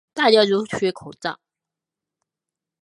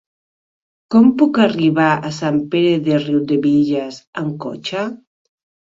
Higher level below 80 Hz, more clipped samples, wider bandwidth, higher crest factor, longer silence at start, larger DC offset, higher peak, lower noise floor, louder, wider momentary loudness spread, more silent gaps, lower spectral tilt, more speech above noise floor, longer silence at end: second, -64 dBFS vs -58 dBFS; neither; first, 11 kHz vs 7.8 kHz; first, 22 dB vs 16 dB; second, 0.15 s vs 0.9 s; neither; about the same, -2 dBFS vs -2 dBFS; about the same, -87 dBFS vs under -90 dBFS; second, -20 LUFS vs -16 LUFS; first, 15 LU vs 12 LU; second, none vs 4.07-4.13 s; second, -4.5 dB/octave vs -7 dB/octave; second, 67 dB vs over 74 dB; first, 1.5 s vs 0.7 s